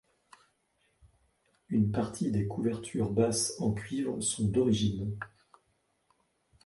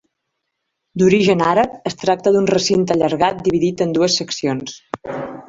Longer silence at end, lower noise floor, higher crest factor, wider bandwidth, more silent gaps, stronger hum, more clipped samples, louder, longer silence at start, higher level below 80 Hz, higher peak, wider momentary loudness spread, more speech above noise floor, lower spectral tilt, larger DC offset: first, 1.4 s vs 0.05 s; about the same, -75 dBFS vs -75 dBFS; about the same, 18 dB vs 16 dB; first, 11.5 kHz vs 7.8 kHz; neither; neither; neither; second, -31 LUFS vs -17 LUFS; first, 1.7 s vs 0.95 s; about the same, -56 dBFS vs -52 dBFS; second, -14 dBFS vs -2 dBFS; second, 7 LU vs 13 LU; second, 45 dB vs 59 dB; about the same, -5.5 dB/octave vs -5 dB/octave; neither